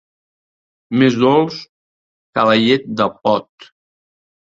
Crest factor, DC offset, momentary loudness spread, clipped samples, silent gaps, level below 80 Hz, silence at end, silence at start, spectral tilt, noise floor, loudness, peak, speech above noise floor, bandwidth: 18 dB; under 0.1%; 10 LU; under 0.1%; 1.69-2.33 s; -58 dBFS; 1 s; 0.9 s; -6.5 dB/octave; under -90 dBFS; -16 LUFS; 0 dBFS; over 75 dB; 7.6 kHz